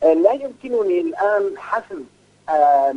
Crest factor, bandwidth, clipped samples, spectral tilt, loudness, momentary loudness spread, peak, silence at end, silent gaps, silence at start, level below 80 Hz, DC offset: 16 dB; 10 kHz; under 0.1%; -6 dB/octave; -19 LUFS; 16 LU; -2 dBFS; 0 s; none; 0 s; -66 dBFS; under 0.1%